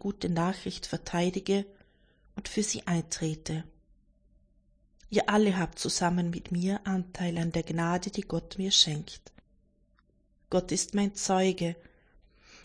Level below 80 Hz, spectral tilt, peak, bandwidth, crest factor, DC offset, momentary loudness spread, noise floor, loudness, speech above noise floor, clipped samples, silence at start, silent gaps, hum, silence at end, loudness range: -54 dBFS; -4 dB/octave; -10 dBFS; 10.5 kHz; 22 dB; under 0.1%; 11 LU; -67 dBFS; -30 LUFS; 38 dB; under 0.1%; 0.05 s; none; none; 0.05 s; 5 LU